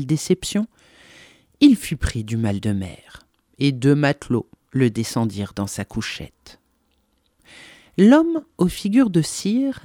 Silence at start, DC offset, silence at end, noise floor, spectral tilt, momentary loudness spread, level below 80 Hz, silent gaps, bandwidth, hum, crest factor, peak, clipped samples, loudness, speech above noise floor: 0 s; under 0.1%; 0.05 s; -66 dBFS; -6 dB/octave; 12 LU; -42 dBFS; none; 17 kHz; none; 20 dB; 0 dBFS; under 0.1%; -20 LUFS; 46 dB